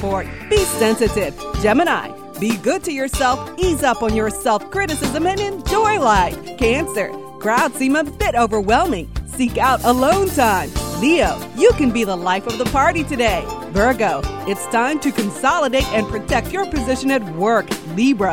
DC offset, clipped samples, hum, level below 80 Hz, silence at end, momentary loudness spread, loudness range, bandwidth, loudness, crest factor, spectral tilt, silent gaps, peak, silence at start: 0.3%; under 0.1%; none; -32 dBFS; 0 s; 7 LU; 2 LU; 19.5 kHz; -18 LUFS; 16 dB; -4.5 dB/octave; none; -2 dBFS; 0 s